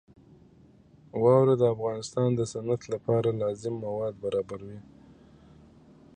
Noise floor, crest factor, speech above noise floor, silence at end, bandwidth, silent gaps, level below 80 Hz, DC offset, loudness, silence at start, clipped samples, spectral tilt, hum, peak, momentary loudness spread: -57 dBFS; 20 dB; 30 dB; 1.35 s; 9.8 kHz; none; -62 dBFS; under 0.1%; -27 LUFS; 1.15 s; under 0.1%; -7.5 dB/octave; none; -8 dBFS; 17 LU